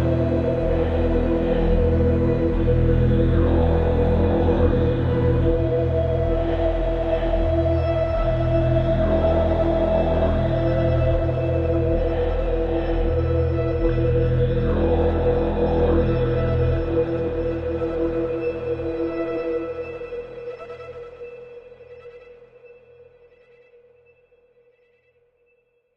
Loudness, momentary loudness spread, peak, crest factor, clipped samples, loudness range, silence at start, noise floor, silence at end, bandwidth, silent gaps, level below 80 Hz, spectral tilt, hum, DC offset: -21 LUFS; 8 LU; -6 dBFS; 14 dB; under 0.1%; 10 LU; 0 s; -65 dBFS; 3.3 s; 5.6 kHz; none; -28 dBFS; -10 dB/octave; none; under 0.1%